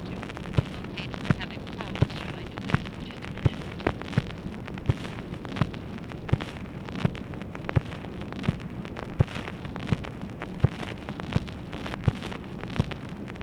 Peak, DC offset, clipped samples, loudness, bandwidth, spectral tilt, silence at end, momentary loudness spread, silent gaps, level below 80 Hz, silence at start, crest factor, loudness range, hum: -4 dBFS; under 0.1%; under 0.1%; -32 LUFS; 12 kHz; -7 dB/octave; 0 s; 9 LU; none; -44 dBFS; 0 s; 26 dB; 1 LU; none